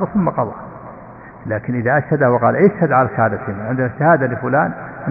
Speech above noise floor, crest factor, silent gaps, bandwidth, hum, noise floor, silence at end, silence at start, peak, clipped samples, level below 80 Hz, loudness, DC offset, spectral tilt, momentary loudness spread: 21 dB; 16 dB; none; 4.7 kHz; none; -37 dBFS; 0 s; 0 s; -2 dBFS; under 0.1%; -50 dBFS; -17 LUFS; under 0.1%; -12.5 dB/octave; 19 LU